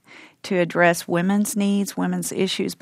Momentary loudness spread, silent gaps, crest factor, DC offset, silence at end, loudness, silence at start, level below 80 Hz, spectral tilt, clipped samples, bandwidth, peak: 6 LU; none; 20 dB; under 0.1%; 0.05 s; -21 LUFS; 0.1 s; -66 dBFS; -5 dB/octave; under 0.1%; 16 kHz; -2 dBFS